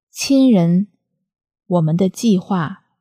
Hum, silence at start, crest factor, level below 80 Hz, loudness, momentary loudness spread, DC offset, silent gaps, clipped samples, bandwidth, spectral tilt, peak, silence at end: none; 0.15 s; 14 dB; -62 dBFS; -16 LUFS; 9 LU; under 0.1%; none; under 0.1%; 15.5 kHz; -6.5 dB/octave; -4 dBFS; 0.25 s